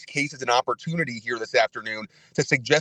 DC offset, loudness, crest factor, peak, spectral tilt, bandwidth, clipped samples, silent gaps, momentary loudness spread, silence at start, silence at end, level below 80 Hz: under 0.1%; -25 LUFS; 22 dB; -4 dBFS; -4 dB/octave; 10.5 kHz; under 0.1%; none; 9 LU; 0 s; 0 s; -66 dBFS